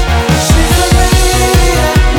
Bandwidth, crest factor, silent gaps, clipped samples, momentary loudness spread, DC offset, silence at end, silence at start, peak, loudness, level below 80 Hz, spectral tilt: 18.5 kHz; 8 dB; none; under 0.1%; 1 LU; under 0.1%; 0 s; 0 s; 0 dBFS; -9 LUFS; -12 dBFS; -4.5 dB/octave